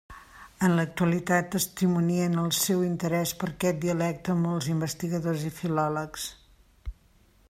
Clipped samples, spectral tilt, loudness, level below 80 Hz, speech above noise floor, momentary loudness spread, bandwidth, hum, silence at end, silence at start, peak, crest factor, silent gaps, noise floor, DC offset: under 0.1%; -5 dB/octave; -27 LUFS; -52 dBFS; 34 dB; 11 LU; 16 kHz; none; 0.55 s; 0.1 s; -10 dBFS; 18 dB; none; -60 dBFS; under 0.1%